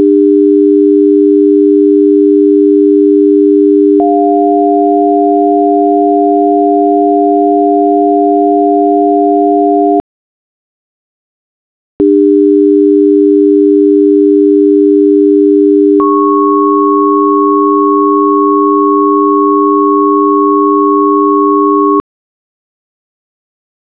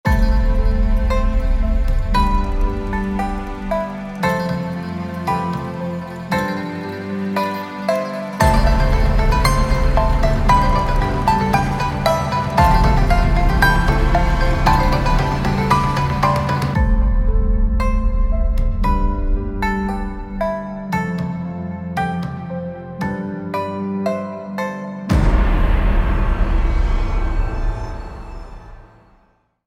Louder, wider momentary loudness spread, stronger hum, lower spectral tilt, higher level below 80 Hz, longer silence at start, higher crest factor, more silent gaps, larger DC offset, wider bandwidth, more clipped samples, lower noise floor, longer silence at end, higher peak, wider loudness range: first, -8 LUFS vs -19 LUFS; second, 2 LU vs 10 LU; neither; first, -11.5 dB/octave vs -6.5 dB/octave; second, -56 dBFS vs -20 dBFS; about the same, 0 s vs 0.05 s; second, 8 dB vs 16 dB; first, 10.00-12.00 s vs none; first, 0.4% vs under 0.1%; second, 3.4 kHz vs 13.5 kHz; first, 0.9% vs under 0.1%; first, under -90 dBFS vs -58 dBFS; first, 2 s vs 0.8 s; about the same, 0 dBFS vs 0 dBFS; about the same, 5 LU vs 7 LU